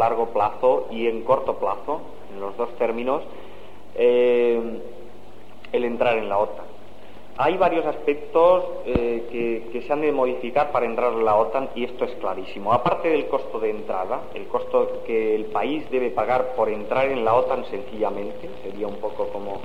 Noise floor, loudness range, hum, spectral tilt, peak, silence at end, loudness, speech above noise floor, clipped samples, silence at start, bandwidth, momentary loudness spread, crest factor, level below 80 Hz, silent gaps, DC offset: -46 dBFS; 3 LU; none; -7 dB/octave; -6 dBFS; 0 s; -23 LUFS; 23 dB; under 0.1%; 0 s; 7.4 kHz; 12 LU; 18 dB; -50 dBFS; none; 2%